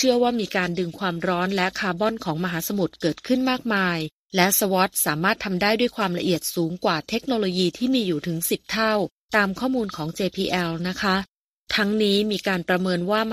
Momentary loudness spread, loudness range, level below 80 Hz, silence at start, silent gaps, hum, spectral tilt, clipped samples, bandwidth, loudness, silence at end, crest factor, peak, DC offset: 6 LU; 3 LU; -56 dBFS; 0 s; 4.12-4.29 s, 9.12-9.28 s, 11.28-11.65 s; none; -4 dB/octave; under 0.1%; 15.5 kHz; -23 LUFS; 0 s; 22 dB; 0 dBFS; under 0.1%